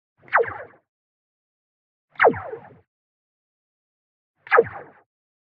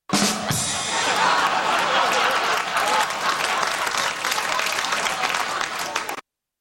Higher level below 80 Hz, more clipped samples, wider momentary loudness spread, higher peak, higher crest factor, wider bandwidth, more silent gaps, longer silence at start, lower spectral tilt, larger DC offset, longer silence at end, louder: second, -70 dBFS vs -58 dBFS; neither; first, 21 LU vs 6 LU; about the same, -2 dBFS vs -4 dBFS; first, 24 dB vs 18 dB; second, 5 kHz vs 16.5 kHz; first, 0.88-2.08 s, 2.87-4.34 s vs none; first, 0.3 s vs 0.1 s; about the same, -2.5 dB/octave vs -1.5 dB/octave; neither; first, 0.75 s vs 0.4 s; about the same, -21 LUFS vs -21 LUFS